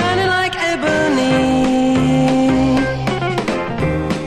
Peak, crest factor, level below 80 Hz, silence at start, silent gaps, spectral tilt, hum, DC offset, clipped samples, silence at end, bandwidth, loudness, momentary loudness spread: -4 dBFS; 10 dB; -34 dBFS; 0 s; none; -5.5 dB/octave; none; under 0.1%; under 0.1%; 0 s; 12 kHz; -16 LUFS; 5 LU